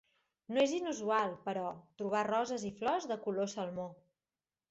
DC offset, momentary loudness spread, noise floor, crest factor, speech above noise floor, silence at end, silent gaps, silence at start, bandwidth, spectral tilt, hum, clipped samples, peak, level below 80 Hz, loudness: under 0.1%; 9 LU; under -90 dBFS; 18 dB; over 55 dB; 0.75 s; none; 0.5 s; 8 kHz; -3.5 dB/octave; none; under 0.1%; -20 dBFS; -76 dBFS; -36 LUFS